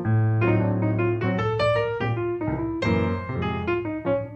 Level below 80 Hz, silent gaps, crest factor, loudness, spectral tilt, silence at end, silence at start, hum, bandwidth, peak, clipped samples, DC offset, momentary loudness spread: -46 dBFS; none; 14 dB; -24 LUFS; -8.5 dB/octave; 0 s; 0 s; none; 8.2 kHz; -10 dBFS; under 0.1%; under 0.1%; 5 LU